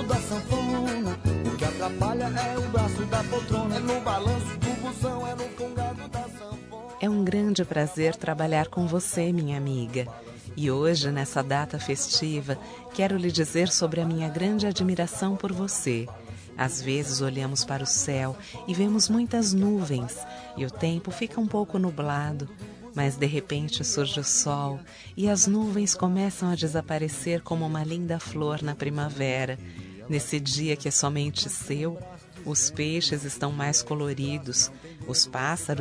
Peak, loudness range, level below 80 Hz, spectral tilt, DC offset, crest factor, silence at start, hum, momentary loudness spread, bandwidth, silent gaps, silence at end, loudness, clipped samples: -8 dBFS; 4 LU; -50 dBFS; -4 dB/octave; under 0.1%; 20 dB; 0 s; none; 10 LU; 11 kHz; none; 0 s; -27 LUFS; under 0.1%